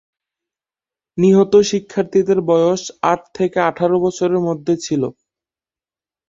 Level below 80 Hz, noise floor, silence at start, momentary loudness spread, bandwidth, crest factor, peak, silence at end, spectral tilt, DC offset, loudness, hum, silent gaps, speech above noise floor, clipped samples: -58 dBFS; under -90 dBFS; 1.15 s; 7 LU; 7.8 kHz; 16 dB; -2 dBFS; 1.2 s; -6 dB/octave; under 0.1%; -16 LUFS; none; none; over 74 dB; under 0.1%